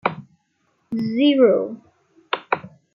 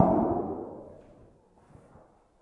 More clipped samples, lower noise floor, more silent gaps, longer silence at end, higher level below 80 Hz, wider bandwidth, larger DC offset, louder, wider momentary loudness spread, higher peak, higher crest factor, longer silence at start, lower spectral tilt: neither; first, -67 dBFS vs -59 dBFS; neither; second, 0.25 s vs 1.45 s; second, -70 dBFS vs -56 dBFS; first, 5.8 kHz vs 3.7 kHz; neither; first, -20 LUFS vs -30 LUFS; second, 17 LU vs 25 LU; about the same, -2 dBFS vs -4 dBFS; second, 20 dB vs 26 dB; about the same, 0.05 s vs 0 s; second, -8 dB/octave vs -11.5 dB/octave